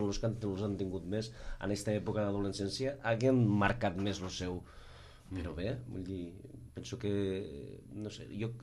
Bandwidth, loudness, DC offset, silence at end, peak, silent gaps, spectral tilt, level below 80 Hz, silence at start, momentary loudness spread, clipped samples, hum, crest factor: 12.5 kHz; -36 LUFS; under 0.1%; 0 s; -14 dBFS; none; -6 dB/octave; -54 dBFS; 0 s; 17 LU; under 0.1%; none; 22 dB